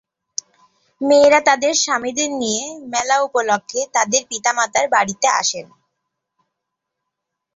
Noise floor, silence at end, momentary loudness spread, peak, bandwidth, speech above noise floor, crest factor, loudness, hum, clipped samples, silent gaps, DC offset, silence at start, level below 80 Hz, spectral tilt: -80 dBFS; 1.9 s; 12 LU; -2 dBFS; 8 kHz; 63 dB; 18 dB; -17 LUFS; none; under 0.1%; none; under 0.1%; 1 s; -64 dBFS; -1 dB/octave